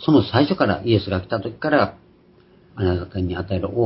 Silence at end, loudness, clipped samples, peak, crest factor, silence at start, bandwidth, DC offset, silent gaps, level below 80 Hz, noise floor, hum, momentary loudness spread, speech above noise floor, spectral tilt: 0 s; -21 LUFS; under 0.1%; -2 dBFS; 18 dB; 0 s; 5.8 kHz; under 0.1%; none; -38 dBFS; -52 dBFS; none; 9 LU; 33 dB; -11.5 dB/octave